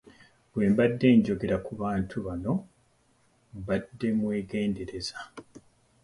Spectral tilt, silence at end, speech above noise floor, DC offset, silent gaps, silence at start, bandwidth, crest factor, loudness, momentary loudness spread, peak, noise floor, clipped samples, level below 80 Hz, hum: -7 dB/octave; 0.45 s; 39 dB; under 0.1%; none; 0.55 s; 11.5 kHz; 20 dB; -28 LUFS; 18 LU; -10 dBFS; -66 dBFS; under 0.1%; -54 dBFS; none